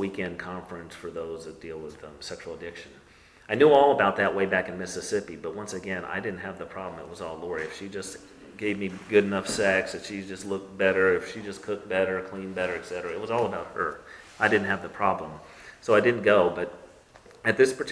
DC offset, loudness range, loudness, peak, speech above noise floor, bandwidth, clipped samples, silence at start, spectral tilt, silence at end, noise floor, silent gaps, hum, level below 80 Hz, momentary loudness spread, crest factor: under 0.1%; 9 LU; -27 LUFS; -6 dBFS; 26 dB; 11 kHz; under 0.1%; 0 s; -4.5 dB/octave; 0 s; -52 dBFS; none; none; -60 dBFS; 18 LU; 22 dB